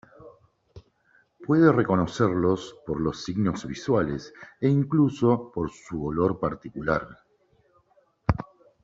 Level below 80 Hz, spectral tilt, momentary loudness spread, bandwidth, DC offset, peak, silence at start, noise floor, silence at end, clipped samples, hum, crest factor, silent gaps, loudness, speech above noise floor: -48 dBFS; -7.5 dB/octave; 12 LU; 7.8 kHz; under 0.1%; -4 dBFS; 0.25 s; -65 dBFS; 0.4 s; under 0.1%; none; 22 dB; none; -25 LUFS; 40 dB